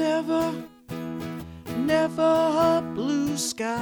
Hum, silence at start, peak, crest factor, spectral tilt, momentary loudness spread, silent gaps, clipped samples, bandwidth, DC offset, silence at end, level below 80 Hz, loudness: none; 0 s; -10 dBFS; 14 dB; -4.5 dB/octave; 15 LU; none; under 0.1%; over 20 kHz; under 0.1%; 0 s; -56 dBFS; -25 LUFS